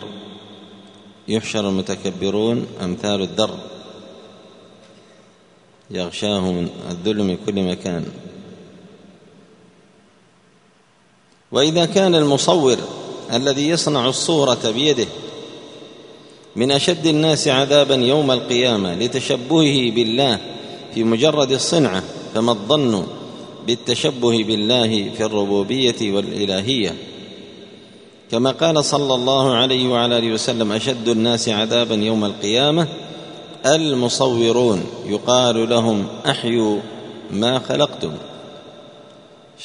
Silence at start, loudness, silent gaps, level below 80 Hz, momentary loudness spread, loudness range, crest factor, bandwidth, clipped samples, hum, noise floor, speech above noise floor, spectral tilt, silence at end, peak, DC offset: 0 s; -18 LUFS; none; -58 dBFS; 18 LU; 9 LU; 20 dB; 10.5 kHz; under 0.1%; none; -55 dBFS; 37 dB; -4.5 dB/octave; 0 s; 0 dBFS; under 0.1%